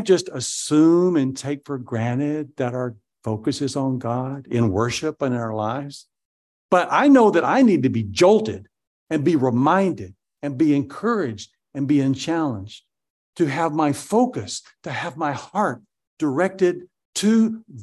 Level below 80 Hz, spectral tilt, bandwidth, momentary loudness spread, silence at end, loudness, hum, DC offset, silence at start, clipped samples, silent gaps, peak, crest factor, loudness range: -56 dBFS; -6 dB/octave; 12.5 kHz; 15 LU; 0 s; -21 LUFS; none; under 0.1%; 0 s; under 0.1%; 6.25-6.69 s, 8.87-9.07 s, 13.10-13.33 s, 16.07-16.17 s, 17.05-17.13 s; -4 dBFS; 18 dB; 6 LU